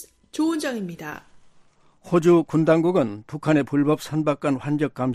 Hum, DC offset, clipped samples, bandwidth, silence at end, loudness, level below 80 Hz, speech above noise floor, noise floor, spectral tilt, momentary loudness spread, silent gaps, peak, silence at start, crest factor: none; under 0.1%; under 0.1%; 14.5 kHz; 0 s; -22 LUFS; -62 dBFS; 33 dB; -55 dBFS; -7 dB/octave; 15 LU; none; -4 dBFS; 0 s; 18 dB